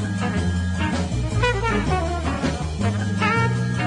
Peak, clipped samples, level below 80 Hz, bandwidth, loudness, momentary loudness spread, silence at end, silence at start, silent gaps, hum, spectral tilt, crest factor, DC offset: -4 dBFS; under 0.1%; -32 dBFS; 11 kHz; -22 LUFS; 4 LU; 0 s; 0 s; none; none; -6 dB/octave; 16 dB; under 0.1%